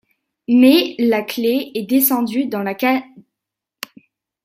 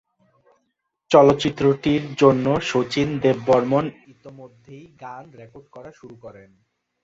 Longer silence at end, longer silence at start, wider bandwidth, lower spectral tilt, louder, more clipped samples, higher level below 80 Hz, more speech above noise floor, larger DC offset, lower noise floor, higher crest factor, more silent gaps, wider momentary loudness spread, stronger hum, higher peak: first, 1.25 s vs 0.75 s; second, 0.5 s vs 1.1 s; first, 16 kHz vs 7.8 kHz; second, -4 dB/octave vs -6.5 dB/octave; first, -16 LUFS vs -19 LUFS; neither; second, -66 dBFS vs -54 dBFS; first, 67 dB vs 54 dB; neither; first, -83 dBFS vs -75 dBFS; about the same, 16 dB vs 20 dB; neither; second, 22 LU vs 25 LU; neither; about the same, -2 dBFS vs -2 dBFS